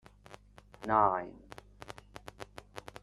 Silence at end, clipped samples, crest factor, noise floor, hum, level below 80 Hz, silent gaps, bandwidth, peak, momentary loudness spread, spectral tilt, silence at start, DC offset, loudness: 0.05 s; under 0.1%; 24 dB; -56 dBFS; 50 Hz at -60 dBFS; -60 dBFS; none; 13.5 kHz; -12 dBFS; 27 LU; -6 dB/octave; 0.3 s; under 0.1%; -31 LUFS